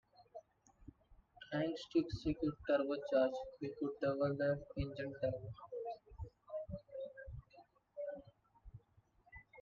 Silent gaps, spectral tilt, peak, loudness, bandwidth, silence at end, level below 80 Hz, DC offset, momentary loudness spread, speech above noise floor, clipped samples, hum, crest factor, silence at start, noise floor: none; -7.5 dB/octave; -22 dBFS; -41 LUFS; 7.4 kHz; 0 s; -62 dBFS; under 0.1%; 22 LU; 33 dB; under 0.1%; none; 20 dB; 0.2 s; -72 dBFS